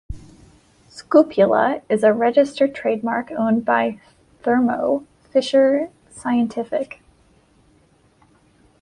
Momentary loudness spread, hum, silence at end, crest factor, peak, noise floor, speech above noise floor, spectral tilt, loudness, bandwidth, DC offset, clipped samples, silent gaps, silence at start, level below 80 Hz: 11 LU; none; 1.95 s; 18 dB; -2 dBFS; -57 dBFS; 39 dB; -6 dB/octave; -19 LUFS; 11 kHz; under 0.1%; under 0.1%; none; 0.1 s; -50 dBFS